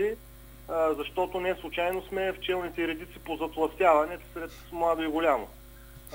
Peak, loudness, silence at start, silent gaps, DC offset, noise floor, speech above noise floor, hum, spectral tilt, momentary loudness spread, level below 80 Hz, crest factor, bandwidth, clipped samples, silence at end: -10 dBFS; -29 LUFS; 0 s; none; under 0.1%; -49 dBFS; 20 dB; none; -5 dB/octave; 15 LU; -50 dBFS; 20 dB; 16 kHz; under 0.1%; 0 s